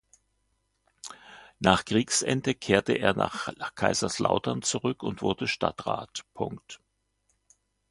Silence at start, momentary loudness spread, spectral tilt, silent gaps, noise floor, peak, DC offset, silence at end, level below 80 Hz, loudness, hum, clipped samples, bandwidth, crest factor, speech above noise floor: 1.05 s; 19 LU; -4 dB/octave; none; -74 dBFS; -2 dBFS; under 0.1%; 1.15 s; -56 dBFS; -27 LUFS; none; under 0.1%; 11.5 kHz; 26 dB; 47 dB